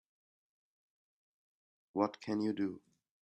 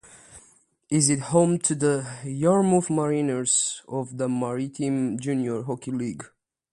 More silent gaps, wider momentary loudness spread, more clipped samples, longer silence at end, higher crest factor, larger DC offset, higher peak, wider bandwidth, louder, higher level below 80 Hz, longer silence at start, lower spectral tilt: neither; about the same, 8 LU vs 10 LU; neither; about the same, 0.45 s vs 0.45 s; about the same, 24 dB vs 20 dB; neither; second, -16 dBFS vs -6 dBFS; second, 8.6 kHz vs 11.5 kHz; second, -37 LUFS vs -24 LUFS; second, -84 dBFS vs -64 dBFS; first, 1.95 s vs 0.15 s; first, -7 dB/octave vs -5 dB/octave